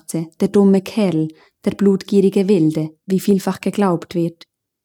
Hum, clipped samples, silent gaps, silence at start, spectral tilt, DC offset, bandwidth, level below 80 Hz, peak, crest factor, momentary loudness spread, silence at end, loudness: none; under 0.1%; none; 0.1 s; -7.5 dB/octave; under 0.1%; 18.5 kHz; -62 dBFS; -4 dBFS; 14 dB; 10 LU; 0.5 s; -17 LUFS